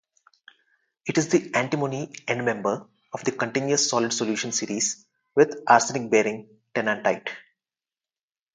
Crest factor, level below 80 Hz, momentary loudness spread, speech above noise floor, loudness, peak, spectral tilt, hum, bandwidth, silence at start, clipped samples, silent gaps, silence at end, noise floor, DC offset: 24 dB; -72 dBFS; 12 LU; over 66 dB; -24 LUFS; -2 dBFS; -3.5 dB/octave; none; 10 kHz; 1.05 s; under 0.1%; none; 1.15 s; under -90 dBFS; under 0.1%